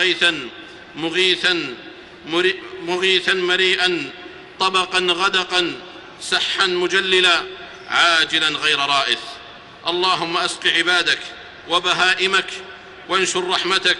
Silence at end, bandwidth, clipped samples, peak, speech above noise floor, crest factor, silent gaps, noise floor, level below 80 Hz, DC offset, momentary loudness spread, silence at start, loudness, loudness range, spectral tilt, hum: 0 s; 11.5 kHz; under 0.1%; -4 dBFS; 20 dB; 16 dB; none; -39 dBFS; -58 dBFS; under 0.1%; 18 LU; 0 s; -17 LUFS; 2 LU; -2 dB/octave; none